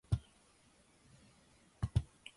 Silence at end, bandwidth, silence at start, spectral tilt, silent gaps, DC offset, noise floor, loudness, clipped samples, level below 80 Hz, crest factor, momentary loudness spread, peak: 0.3 s; 11.5 kHz; 0.1 s; -6.5 dB/octave; none; under 0.1%; -68 dBFS; -40 LUFS; under 0.1%; -50 dBFS; 24 dB; 26 LU; -20 dBFS